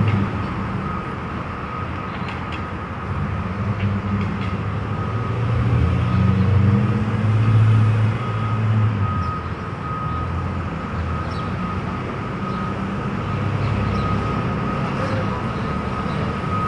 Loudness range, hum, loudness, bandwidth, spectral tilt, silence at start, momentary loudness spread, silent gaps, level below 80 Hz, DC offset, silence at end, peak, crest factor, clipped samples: 7 LU; none; -22 LUFS; 7.4 kHz; -8.5 dB/octave; 0 s; 10 LU; none; -36 dBFS; under 0.1%; 0 s; -6 dBFS; 16 dB; under 0.1%